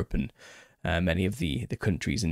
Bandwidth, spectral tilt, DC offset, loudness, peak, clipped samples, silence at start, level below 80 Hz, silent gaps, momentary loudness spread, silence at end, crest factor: 15 kHz; -5.5 dB/octave; under 0.1%; -30 LUFS; -14 dBFS; under 0.1%; 0 s; -40 dBFS; none; 12 LU; 0 s; 16 dB